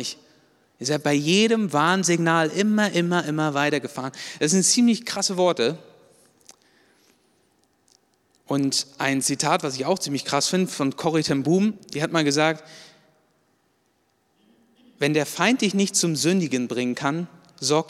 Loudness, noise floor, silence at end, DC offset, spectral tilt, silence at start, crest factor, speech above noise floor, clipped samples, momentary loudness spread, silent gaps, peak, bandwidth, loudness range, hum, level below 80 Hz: -22 LUFS; -67 dBFS; 0.05 s; under 0.1%; -4 dB/octave; 0 s; 20 dB; 45 dB; under 0.1%; 8 LU; none; -4 dBFS; 16 kHz; 7 LU; none; -70 dBFS